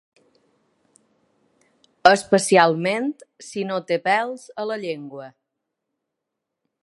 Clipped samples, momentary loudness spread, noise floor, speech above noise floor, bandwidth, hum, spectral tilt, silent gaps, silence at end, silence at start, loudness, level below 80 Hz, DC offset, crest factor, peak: under 0.1%; 17 LU; -82 dBFS; 61 dB; 11.5 kHz; none; -4 dB/octave; none; 1.55 s; 2.05 s; -20 LUFS; -68 dBFS; under 0.1%; 24 dB; 0 dBFS